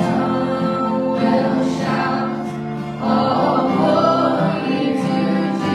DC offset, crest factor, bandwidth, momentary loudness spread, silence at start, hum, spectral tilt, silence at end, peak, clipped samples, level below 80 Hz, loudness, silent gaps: under 0.1%; 14 dB; 11.5 kHz; 7 LU; 0 s; none; -7 dB/octave; 0 s; -4 dBFS; under 0.1%; -54 dBFS; -18 LUFS; none